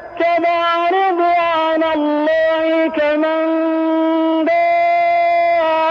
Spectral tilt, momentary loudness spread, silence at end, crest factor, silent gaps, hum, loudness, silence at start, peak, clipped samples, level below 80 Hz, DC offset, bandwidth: -5 dB/octave; 2 LU; 0 s; 10 dB; none; none; -15 LUFS; 0 s; -4 dBFS; under 0.1%; -58 dBFS; under 0.1%; 6.2 kHz